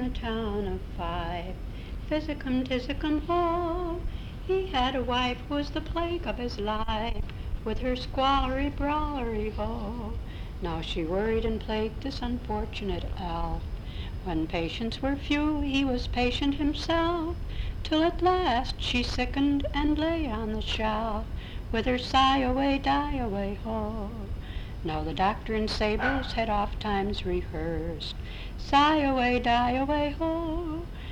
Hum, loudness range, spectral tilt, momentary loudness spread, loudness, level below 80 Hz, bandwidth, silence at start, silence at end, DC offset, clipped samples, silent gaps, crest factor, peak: none; 5 LU; -6 dB/octave; 11 LU; -29 LUFS; -36 dBFS; 11.5 kHz; 0 s; 0 s; under 0.1%; under 0.1%; none; 18 dB; -10 dBFS